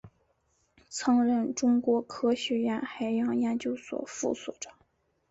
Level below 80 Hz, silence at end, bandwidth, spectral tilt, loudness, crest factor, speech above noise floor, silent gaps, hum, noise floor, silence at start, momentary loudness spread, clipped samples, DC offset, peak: -68 dBFS; 0.6 s; 8 kHz; -4 dB/octave; -29 LUFS; 14 dB; 44 dB; none; none; -72 dBFS; 0.05 s; 12 LU; under 0.1%; under 0.1%; -16 dBFS